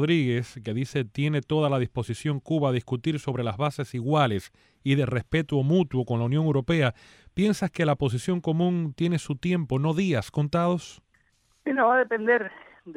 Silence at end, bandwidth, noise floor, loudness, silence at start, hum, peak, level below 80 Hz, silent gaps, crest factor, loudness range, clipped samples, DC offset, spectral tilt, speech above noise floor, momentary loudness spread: 0.05 s; 12.5 kHz; -66 dBFS; -26 LUFS; 0 s; none; -10 dBFS; -56 dBFS; none; 16 dB; 2 LU; under 0.1%; under 0.1%; -7 dB/octave; 41 dB; 7 LU